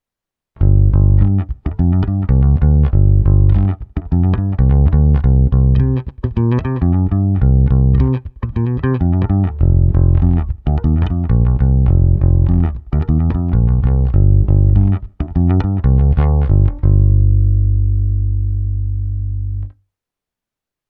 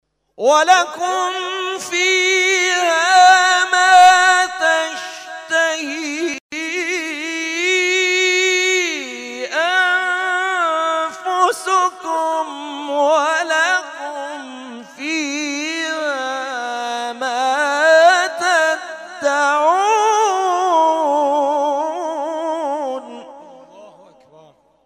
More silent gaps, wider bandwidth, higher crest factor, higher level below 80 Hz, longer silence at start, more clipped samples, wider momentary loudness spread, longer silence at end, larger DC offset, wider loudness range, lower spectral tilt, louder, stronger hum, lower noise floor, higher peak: second, none vs 6.40-6.49 s; second, 3.4 kHz vs 15.5 kHz; about the same, 12 dB vs 14 dB; first, -16 dBFS vs -70 dBFS; first, 0.6 s vs 0.4 s; neither; second, 8 LU vs 13 LU; first, 1.2 s vs 0.95 s; neither; second, 2 LU vs 9 LU; first, -12.5 dB/octave vs 0.5 dB/octave; about the same, -15 LUFS vs -16 LUFS; first, 50 Hz at -30 dBFS vs none; first, -86 dBFS vs -49 dBFS; about the same, 0 dBFS vs -2 dBFS